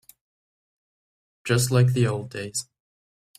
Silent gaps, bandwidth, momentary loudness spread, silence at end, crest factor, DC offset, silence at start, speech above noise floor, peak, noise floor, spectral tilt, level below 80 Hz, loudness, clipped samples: none; 15 kHz; 12 LU; 0.75 s; 18 dB; under 0.1%; 1.45 s; over 68 dB; -8 dBFS; under -90 dBFS; -5 dB/octave; -58 dBFS; -23 LUFS; under 0.1%